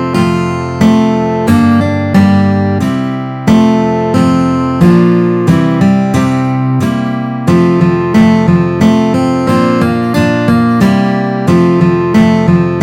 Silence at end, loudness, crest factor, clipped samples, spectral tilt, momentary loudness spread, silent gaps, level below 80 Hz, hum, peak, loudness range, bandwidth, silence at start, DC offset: 0 s; -10 LUFS; 8 dB; 0.4%; -7.5 dB/octave; 5 LU; none; -38 dBFS; none; 0 dBFS; 1 LU; 14 kHz; 0 s; under 0.1%